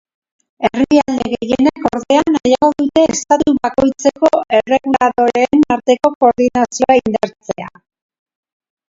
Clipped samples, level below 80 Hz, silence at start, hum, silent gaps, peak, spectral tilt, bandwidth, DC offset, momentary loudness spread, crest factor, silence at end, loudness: under 0.1%; -46 dBFS; 0.6 s; none; 6.15-6.20 s; 0 dBFS; -4.5 dB/octave; 7.8 kHz; under 0.1%; 7 LU; 14 dB; 1.25 s; -14 LUFS